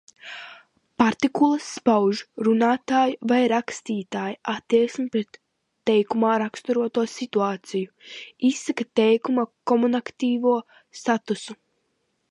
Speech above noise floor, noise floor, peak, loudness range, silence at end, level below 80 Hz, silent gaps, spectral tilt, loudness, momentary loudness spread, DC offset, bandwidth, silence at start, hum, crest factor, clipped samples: 50 dB; -73 dBFS; -6 dBFS; 3 LU; 0.75 s; -68 dBFS; none; -5 dB/octave; -23 LUFS; 14 LU; under 0.1%; 11 kHz; 0.25 s; none; 18 dB; under 0.1%